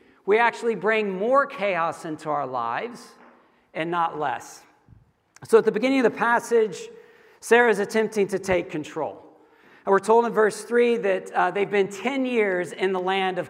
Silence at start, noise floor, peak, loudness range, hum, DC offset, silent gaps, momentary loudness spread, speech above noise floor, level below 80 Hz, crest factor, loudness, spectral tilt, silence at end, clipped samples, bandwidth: 0.25 s; -56 dBFS; -4 dBFS; 6 LU; none; under 0.1%; none; 13 LU; 33 dB; -64 dBFS; 20 dB; -23 LUFS; -4.5 dB/octave; 0 s; under 0.1%; 15 kHz